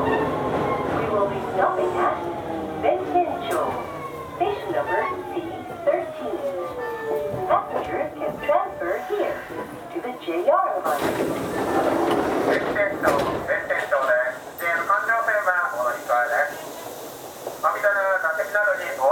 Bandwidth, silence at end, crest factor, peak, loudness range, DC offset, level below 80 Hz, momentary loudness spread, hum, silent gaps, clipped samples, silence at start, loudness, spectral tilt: 19 kHz; 0 s; 18 dB; -4 dBFS; 4 LU; under 0.1%; -54 dBFS; 10 LU; none; none; under 0.1%; 0 s; -24 LUFS; -5 dB/octave